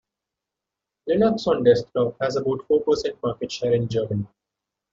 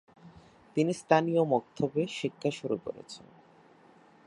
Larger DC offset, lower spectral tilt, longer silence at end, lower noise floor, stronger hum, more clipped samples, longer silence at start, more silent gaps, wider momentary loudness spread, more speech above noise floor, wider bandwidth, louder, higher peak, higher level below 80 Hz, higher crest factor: neither; about the same, -6.5 dB/octave vs -6 dB/octave; second, 0.65 s vs 1.1 s; first, -86 dBFS vs -59 dBFS; neither; neither; first, 1.05 s vs 0.25 s; neither; second, 9 LU vs 17 LU; first, 64 dB vs 29 dB; second, 7.6 kHz vs 11.5 kHz; first, -22 LUFS vs -30 LUFS; first, -4 dBFS vs -8 dBFS; first, -56 dBFS vs -70 dBFS; second, 18 dB vs 24 dB